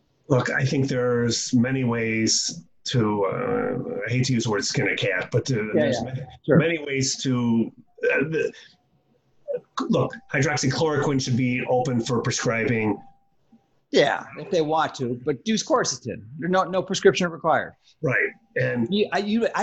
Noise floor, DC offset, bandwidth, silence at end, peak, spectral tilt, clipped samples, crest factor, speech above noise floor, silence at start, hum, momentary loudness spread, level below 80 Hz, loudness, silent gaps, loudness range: -65 dBFS; under 0.1%; 8.8 kHz; 0 s; -4 dBFS; -4.5 dB/octave; under 0.1%; 20 dB; 42 dB; 0.3 s; none; 8 LU; -58 dBFS; -23 LUFS; none; 2 LU